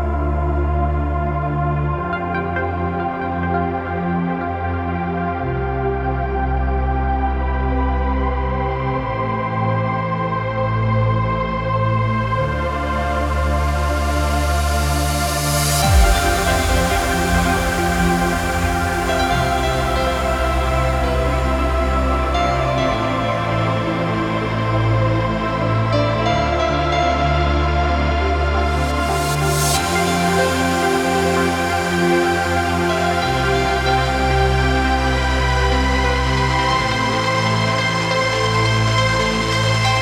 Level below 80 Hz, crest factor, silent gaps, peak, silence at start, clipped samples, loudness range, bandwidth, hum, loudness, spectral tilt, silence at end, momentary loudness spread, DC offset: -24 dBFS; 16 dB; none; -2 dBFS; 0 s; under 0.1%; 4 LU; 18 kHz; none; -18 LUFS; -5 dB/octave; 0 s; 5 LU; under 0.1%